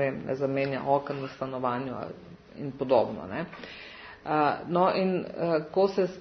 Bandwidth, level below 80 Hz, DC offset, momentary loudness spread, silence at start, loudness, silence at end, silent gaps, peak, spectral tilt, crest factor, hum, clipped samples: 6.4 kHz; -64 dBFS; under 0.1%; 16 LU; 0 s; -28 LUFS; 0 s; none; -10 dBFS; -8 dB/octave; 20 dB; none; under 0.1%